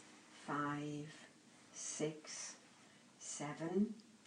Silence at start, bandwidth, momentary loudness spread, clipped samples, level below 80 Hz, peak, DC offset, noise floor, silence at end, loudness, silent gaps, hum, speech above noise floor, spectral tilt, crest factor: 0 s; 10 kHz; 22 LU; under 0.1%; -86 dBFS; -26 dBFS; under 0.1%; -65 dBFS; 0 s; -44 LUFS; none; none; 23 dB; -4.5 dB/octave; 18 dB